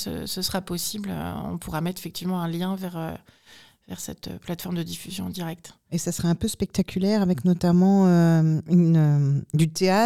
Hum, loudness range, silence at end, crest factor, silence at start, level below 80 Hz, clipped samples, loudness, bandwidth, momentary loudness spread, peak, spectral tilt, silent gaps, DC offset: none; 12 LU; 0 s; 14 dB; 0 s; -52 dBFS; under 0.1%; -24 LUFS; 16 kHz; 16 LU; -8 dBFS; -6.5 dB/octave; none; 0.2%